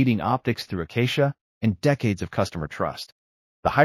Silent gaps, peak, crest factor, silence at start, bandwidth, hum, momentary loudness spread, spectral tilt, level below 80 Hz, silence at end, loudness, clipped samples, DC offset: 1.41-1.61 s, 3.12-3.63 s; -4 dBFS; 20 dB; 0 s; 15 kHz; none; 7 LU; -6.5 dB/octave; -50 dBFS; 0 s; -25 LUFS; under 0.1%; under 0.1%